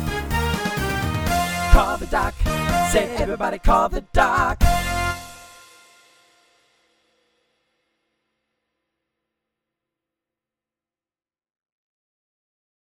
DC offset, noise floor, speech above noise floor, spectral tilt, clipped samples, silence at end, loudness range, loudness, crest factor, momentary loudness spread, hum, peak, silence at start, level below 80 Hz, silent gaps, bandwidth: under 0.1%; under -90 dBFS; over 71 dB; -4.5 dB/octave; under 0.1%; 7.35 s; 8 LU; -21 LUFS; 24 dB; 6 LU; none; 0 dBFS; 0 s; -28 dBFS; none; over 20 kHz